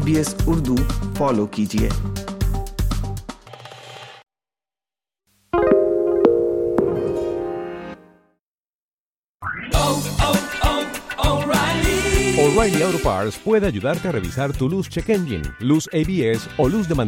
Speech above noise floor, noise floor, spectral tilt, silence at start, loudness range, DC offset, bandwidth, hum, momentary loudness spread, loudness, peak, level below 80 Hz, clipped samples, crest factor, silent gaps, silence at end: over 70 dB; under -90 dBFS; -5.5 dB/octave; 0 s; 8 LU; under 0.1%; 16.5 kHz; none; 13 LU; -20 LUFS; 0 dBFS; -30 dBFS; under 0.1%; 20 dB; 8.39-9.40 s; 0 s